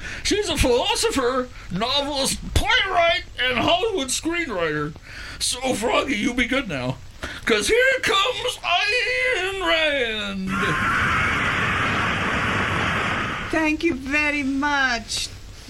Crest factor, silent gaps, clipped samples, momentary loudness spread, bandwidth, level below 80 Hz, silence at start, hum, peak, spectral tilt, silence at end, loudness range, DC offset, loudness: 16 dB; none; under 0.1%; 8 LU; 16 kHz; -38 dBFS; 0 s; none; -6 dBFS; -3 dB/octave; 0 s; 3 LU; under 0.1%; -21 LUFS